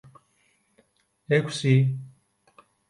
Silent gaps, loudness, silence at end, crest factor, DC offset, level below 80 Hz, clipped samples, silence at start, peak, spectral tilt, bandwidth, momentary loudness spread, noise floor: none; -24 LUFS; 0.8 s; 20 dB; under 0.1%; -68 dBFS; under 0.1%; 1.3 s; -8 dBFS; -6.5 dB/octave; 11.5 kHz; 7 LU; -67 dBFS